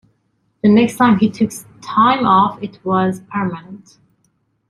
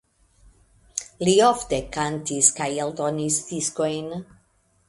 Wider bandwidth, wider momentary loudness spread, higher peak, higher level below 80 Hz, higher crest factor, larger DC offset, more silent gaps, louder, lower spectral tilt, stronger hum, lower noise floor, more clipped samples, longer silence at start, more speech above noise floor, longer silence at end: first, 13.5 kHz vs 11.5 kHz; second, 11 LU vs 15 LU; about the same, -2 dBFS vs -2 dBFS; about the same, -54 dBFS vs -52 dBFS; second, 16 dB vs 22 dB; neither; neither; first, -15 LUFS vs -22 LUFS; first, -6.5 dB/octave vs -3.5 dB/octave; neither; about the same, -64 dBFS vs -64 dBFS; neither; second, 0.65 s vs 0.95 s; first, 49 dB vs 41 dB; first, 0.9 s vs 0.65 s